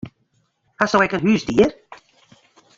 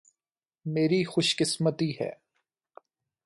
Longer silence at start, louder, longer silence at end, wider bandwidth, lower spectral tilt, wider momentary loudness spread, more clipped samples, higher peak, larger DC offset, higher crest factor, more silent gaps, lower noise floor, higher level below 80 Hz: second, 0.05 s vs 0.65 s; first, -18 LUFS vs -27 LUFS; second, 0.8 s vs 1.1 s; second, 7.8 kHz vs 11.5 kHz; about the same, -5.5 dB/octave vs -4.5 dB/octave; second, 6 LU vs 11 LU; neither; first, -2 dBFS vs -12 dBFS; neither; about the same, 20 dB vs 18 dB; neither; second, -66 dBFS vs under -90 dBFS; first, -52 dBFS vs -72 dBFS